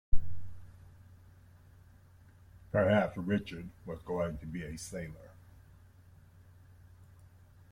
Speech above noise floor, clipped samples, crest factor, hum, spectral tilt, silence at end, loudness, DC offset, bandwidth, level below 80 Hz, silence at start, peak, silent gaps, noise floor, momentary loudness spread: 25 dB; under 0.1%; 22 dB; none; -6.5 dB/octave; 2.45 s; -35 LUFS; under 0.1%; 12 kHz; -46 dBFS; 0.1 s; -12 dBFS; none; -59 dBFS; 29 LU